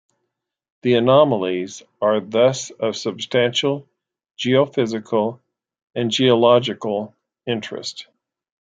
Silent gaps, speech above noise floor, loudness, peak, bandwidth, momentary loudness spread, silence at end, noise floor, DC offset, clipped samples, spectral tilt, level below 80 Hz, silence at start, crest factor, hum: none; 60 dB; -19 LUFS; -2 dBFS; 9.2 kHz; 15 LU; 0.6 s; -78 dBFS; under 0.1%; under 0.1%; -5 dB/octave; -66 dBFS; 0.85 s; 18 dB; none